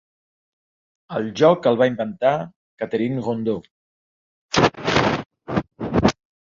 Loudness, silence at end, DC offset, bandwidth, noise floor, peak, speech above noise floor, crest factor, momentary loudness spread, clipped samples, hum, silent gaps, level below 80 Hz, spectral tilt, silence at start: -21 LUFS; 0.4 s; under 0.1%; 7.6 kHz; under -90 dBFS; -2 dBFS; over 70 dB; 20 dB; 12 LU; under 0.1%; none; 2.56-2.77 s, 3.71-4.49 s, 5.26-5.30 s; -46 dBFS; -5.5 dB/octave; 1.1 s